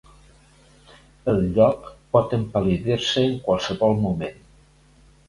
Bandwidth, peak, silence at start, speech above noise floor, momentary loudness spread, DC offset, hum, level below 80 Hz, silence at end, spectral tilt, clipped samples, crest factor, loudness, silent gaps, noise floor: 11.5 kHz; -4 dBFS; 1.25 s; 33 dB; 9 LU; under 0.1%; none; -46 dBFS; 0.95 s; -6.5 dB/octave; under 0.1%; 20 dB; -22 LUFS; none; -54 dBFS